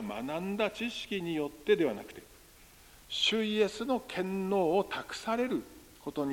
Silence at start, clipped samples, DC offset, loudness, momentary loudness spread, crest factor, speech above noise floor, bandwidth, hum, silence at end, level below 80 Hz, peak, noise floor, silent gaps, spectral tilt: 0 s; under 0.1%; under 0.1%; -32 LUFS; 12 LU; 18 dB; 25 dB; 17 kHz; none; 0 s; -64 dBFS; -14 dBFS; -57 dBFS; none; -4.5 dB/octave